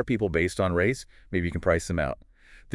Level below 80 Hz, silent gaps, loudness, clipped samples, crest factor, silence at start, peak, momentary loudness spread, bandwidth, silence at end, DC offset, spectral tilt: -46 dBFS; none; -27 LUFS; under 0.1%; 20 dB; 0 s; -8 dBFS; 8 LU; 12 kHz; 0 s; under 0.1%; -6 dB/octave